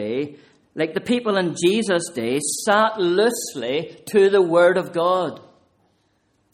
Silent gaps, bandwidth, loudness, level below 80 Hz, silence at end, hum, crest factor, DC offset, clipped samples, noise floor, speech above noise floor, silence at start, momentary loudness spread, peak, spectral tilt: none; 15 kHz; -20 LUFS; -66 dBFS; 1.15 s; none; 16 dB; under 0.1%; under 0.1%; -65 dBFS; 46 dB; 0 s; 11 LU; -4 dBFS; -4 dB/octave